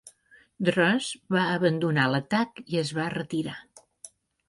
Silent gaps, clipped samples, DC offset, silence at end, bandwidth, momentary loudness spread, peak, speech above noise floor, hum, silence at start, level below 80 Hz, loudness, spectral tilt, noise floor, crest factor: none; under 0.1%; under 0.1%; 0.4 s; 11.5 kHz; 8 LU; -8 dBFS; 33 dB; none; 0.05 s; -68 dBFS; -26 LUFS; -5.5 dB/octave; -59 dBFS; 20 dB